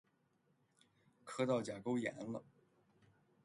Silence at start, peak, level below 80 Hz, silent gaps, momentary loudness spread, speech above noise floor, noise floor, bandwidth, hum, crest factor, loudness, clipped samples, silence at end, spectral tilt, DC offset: 1.25 s; -26 dBFS; -82 dBFS; none; 12 LU; 38 dB; -78 dBFS; 11.5 kHz; none; 20 dB; -41 LUFS; under 0.1%; 1 s; -6 dB/octave; under 0.1%